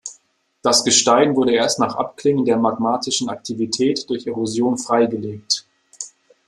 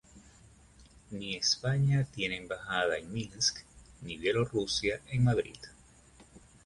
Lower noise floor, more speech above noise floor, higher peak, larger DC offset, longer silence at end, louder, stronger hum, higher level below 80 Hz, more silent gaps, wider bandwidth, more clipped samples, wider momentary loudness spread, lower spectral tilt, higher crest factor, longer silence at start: about the same, -60 dBFS vs -58 dBFS; first, 41 dB vs 27 dB; first, -2 dBFS vs -14 dBFS; neither; first, 0.4 s vs 0.25 s; first, -18 LUFS vs -31 LUFS; neither; second, -62 dBFS vs -56 dBFS; neither; first, 13 kHz vs 11.5 kHz; neither; second, 13 LU vs 16 LU; about the same, -3 dB/octave vs -4 dB/octave; about the same, 18 dB vs 18 dB; about the same, 0.05 s vs 0.15 s